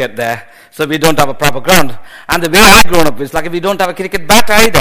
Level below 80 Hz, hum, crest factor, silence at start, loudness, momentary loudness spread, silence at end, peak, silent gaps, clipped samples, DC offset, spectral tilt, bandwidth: -26 dBFS; none; 10 dB; 0 s; -9 LUFS; 15 LU; 0 s; 0 dBFS; none; 2%; 20%; -3 dB/octave; over 20 kHz